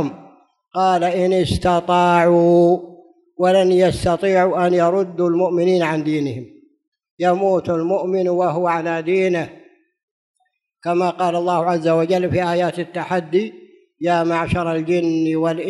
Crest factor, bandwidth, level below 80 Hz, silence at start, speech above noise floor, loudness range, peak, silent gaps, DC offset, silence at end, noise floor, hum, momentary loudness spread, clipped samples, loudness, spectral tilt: 16 dB; 11.5 kHz; -46 dBFS; 0 s; 40 dB; 5 LU; -2 dBFS; 6.88-6.92 s, 7.11-7.17 s, 10.03-10.34 s; under 0.1%; 0 s; -57 dBFS; none; 8 LU; under 0.1%; -18 LUFS; -7 dB/octave